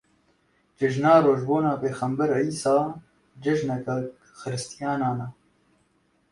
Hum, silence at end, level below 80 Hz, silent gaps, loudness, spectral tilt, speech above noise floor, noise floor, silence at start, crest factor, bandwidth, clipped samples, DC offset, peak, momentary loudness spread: none; 1 s; -64 dBFS; none; -24 LUFS; -6.5 dB/octave; 43 dB; -67 dBFS; 0.8 s; 20 dB; 11.5 kHz; under 0.1%; under 0.1%; -6 dBFS; 15 LU